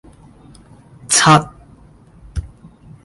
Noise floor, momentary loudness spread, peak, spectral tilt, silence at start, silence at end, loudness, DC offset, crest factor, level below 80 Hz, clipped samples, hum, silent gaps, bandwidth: -45 dBFS; 20 LU; 0 dBFS; -3 dB/octave; 1.1 s; 0.6 s; -12 LUFS; under 0.1%; 20 dB; -38 dBFS; under 0.1%; none; none; 11.5 kHz